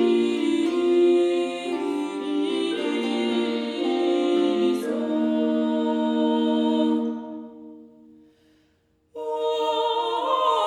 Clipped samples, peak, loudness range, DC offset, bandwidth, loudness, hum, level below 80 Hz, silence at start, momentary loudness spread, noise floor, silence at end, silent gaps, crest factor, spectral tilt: under 0.1%; -10 dBFS; 6 LU; under 0.1%; 11.5 kHz; -23 LUFS; none; -74 dBFS; 0 s; 7 LU; -65 dBFS; 0 s; none; 12 dB; -5 dB/octave